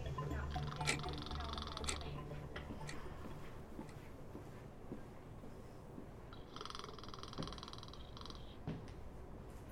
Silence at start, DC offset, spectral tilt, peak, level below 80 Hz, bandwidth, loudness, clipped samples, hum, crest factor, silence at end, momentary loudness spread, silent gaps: 0 s; under 0.1%; -4.5 dB/octave; -22 dBFS; -54 dBFS; 16 kHz; -48 LUFS; under 0.1%; none; 26 dB; 0 s; 12 LU; none